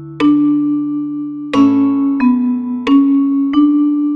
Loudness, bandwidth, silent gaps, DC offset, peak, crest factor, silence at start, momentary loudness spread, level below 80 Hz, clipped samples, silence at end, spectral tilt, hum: -13 LUFS; 6 kHz; none; under 0.1%; -2 dBFS; 12 dB; 0 s; 7 LU; -52 dBFS; under 0.1%; 0 s; -7 dB/octave; none